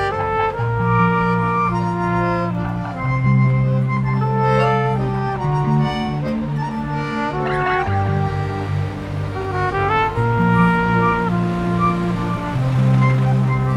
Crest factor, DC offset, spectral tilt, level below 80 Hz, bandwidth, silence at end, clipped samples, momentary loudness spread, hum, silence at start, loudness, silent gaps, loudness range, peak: 16 dB; under 0.1%; -8.5 dB/octave; -36 dBFS; 8.4 kHz; 0 s; under 0.1%; 7 LU; none; 0 s; -19 LUFS; none; 3 LU; -2 dBFS